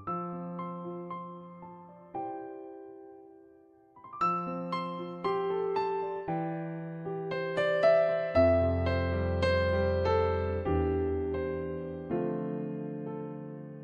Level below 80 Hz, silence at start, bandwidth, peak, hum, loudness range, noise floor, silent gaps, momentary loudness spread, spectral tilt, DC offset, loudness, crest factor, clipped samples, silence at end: -48 dBFS; 0 s; 8.2 kHz; -12 dBFS; none; 13 LU; -59 dBFS; none; 18 LU; -8 dB/octave; under 0.1%; -31 LUFS; 18 dB; under 0.1%; 0 s